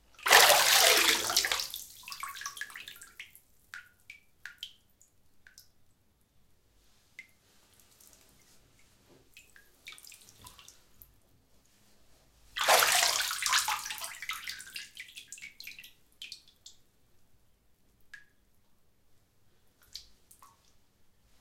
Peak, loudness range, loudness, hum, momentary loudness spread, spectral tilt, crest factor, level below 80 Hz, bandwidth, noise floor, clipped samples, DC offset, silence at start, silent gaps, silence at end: -4 dBFS; 26 LU; -25 LUFS; none; 29 LU; 1.5 dB/octave; 30 dB; -68 dBFS; 17 kHz; -68 dBFS; under 0.1%; under 0.1%; 0.25 s; none; 1.4 s